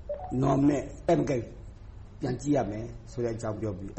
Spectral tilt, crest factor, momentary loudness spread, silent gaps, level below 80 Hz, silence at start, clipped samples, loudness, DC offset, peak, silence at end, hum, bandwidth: -7.5 dB/octave; 16 dB; 21 LU; none; -46 dBFS; 0 s; under 0.1%; -29 LUFS; under 0.1%; -14 dBFS; 0 s; none; 8.4 kHz